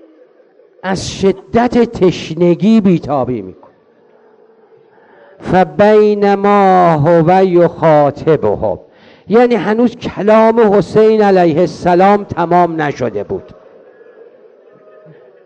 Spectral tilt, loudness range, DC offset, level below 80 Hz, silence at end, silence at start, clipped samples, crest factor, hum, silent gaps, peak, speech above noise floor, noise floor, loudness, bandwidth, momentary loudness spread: -7.5 dB/octave; 6 LU; under 0.1%; -44 dBFS; 2.05 s; 0.85 s; under 0.1%; 12 dB; none; none; 0 dBFS; 37 dB; -48 dBFS; -11 LUFS; 9.6 kHz; 11 LU